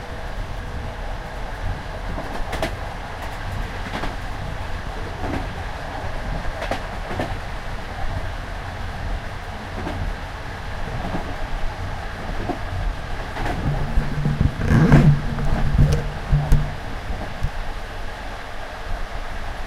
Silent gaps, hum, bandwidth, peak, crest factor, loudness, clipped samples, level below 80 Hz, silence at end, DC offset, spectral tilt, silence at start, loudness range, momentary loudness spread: none; none; 13.5 kHz; -2 dBFS; 22 dB; -26 LUFS; under 0.1%; -28 dBFS; 0 s; under 0.1%; -7 dB/octave; 0 s; 10 LU; 12 LU